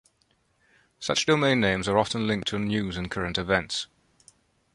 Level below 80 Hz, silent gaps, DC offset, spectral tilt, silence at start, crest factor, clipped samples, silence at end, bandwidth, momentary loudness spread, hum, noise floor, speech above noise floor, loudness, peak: -50 dBFS; none; under 0.1%; -4.5 dB/octave; 1 s; 22 dB; under 0.1%; 0.9 s; 11.5 kHz; 10 LU; none; -68 dBFS; 43 dB; -26 LUFS; -6 dBFS